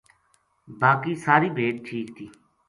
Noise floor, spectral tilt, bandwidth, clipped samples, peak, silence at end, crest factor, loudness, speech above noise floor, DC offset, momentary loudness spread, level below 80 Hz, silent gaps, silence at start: -67 dBFS; -7 dB/octave; 11.5 kHz; under 0.1%; -4 dBFS; 0.4 s; 22 dB; -23 LUFS; 43 dB; under 0.1%; 19 LU; -66 dBFS; none; 0.7 s